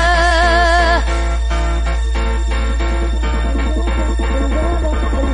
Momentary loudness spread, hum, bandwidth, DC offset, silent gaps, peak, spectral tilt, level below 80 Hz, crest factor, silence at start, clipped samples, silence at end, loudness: 7 LU; none; 10 kHz; under 0.1%; none; -2 dBFS; -5.5 dB/octave; -16 dBFS; 14 dB; 0 s; under 0.1%; 0 s; -16 LUFS